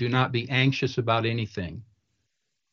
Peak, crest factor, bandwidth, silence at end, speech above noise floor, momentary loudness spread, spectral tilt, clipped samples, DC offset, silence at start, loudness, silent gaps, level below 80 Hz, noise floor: -10 dBFS; 18 dB; 7 kHz; 0.9 s; 54 dB; 13 LU; -6.5 dB/octave; under 0.1%; under 0.1%; 0 s; -25 LUFS; none; -58 dBFS; -80 dBFS